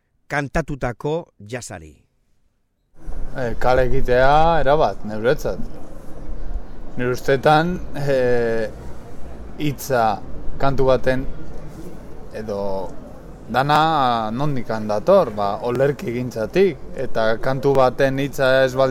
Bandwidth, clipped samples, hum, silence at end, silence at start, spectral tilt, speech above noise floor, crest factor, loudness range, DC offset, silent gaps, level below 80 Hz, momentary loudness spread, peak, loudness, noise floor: 14.5 kHz; under 0.1%; none; 0 s; 0.3 s; -6 dB/octave; 46 dB; 16 dB; 5 LU; under 0.1%; none; -32 dBFS; 21 LU; -2 dBFS; -20 LUFS; -64 dBFS